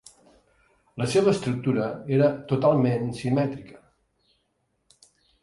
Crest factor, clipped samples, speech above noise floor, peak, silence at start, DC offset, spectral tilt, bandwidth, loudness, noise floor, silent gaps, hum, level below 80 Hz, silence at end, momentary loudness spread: 18 dB; under 0.1%; 50 dB; -8 dBFS; 0.95 s; under 0.1%; -7 dB/octave; 11.5 kHz; -24 LUFS; -73 dBFS; none; none; -60 dBFS; 1.65 s; 9 LU